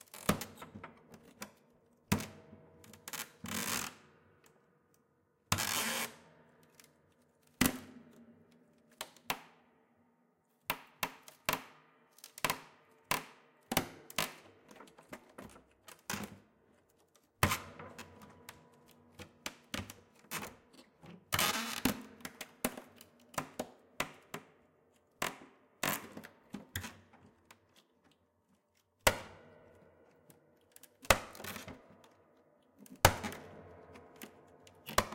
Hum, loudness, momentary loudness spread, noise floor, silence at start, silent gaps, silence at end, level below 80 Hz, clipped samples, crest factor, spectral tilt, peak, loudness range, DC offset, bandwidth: none; -37 LUFS; 25 LU; -75 dBFS; 0.15 s; none; 0 s; -58 dBFS; under 0.1%; 40 dB; -3 dB/octave; -2 dBFS; 7 LU; under 0.1%; 17 kHz